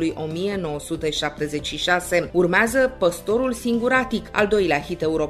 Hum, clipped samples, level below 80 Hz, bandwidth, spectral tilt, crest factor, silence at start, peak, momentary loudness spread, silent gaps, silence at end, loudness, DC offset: none; under 0.1%; -44 dBFS; 14 kHz; -4.5 dB/octave; 18 dB; 0 s; -4 dBFS; 8 LU; none; 0 s; -22 LUFS; under 0.1%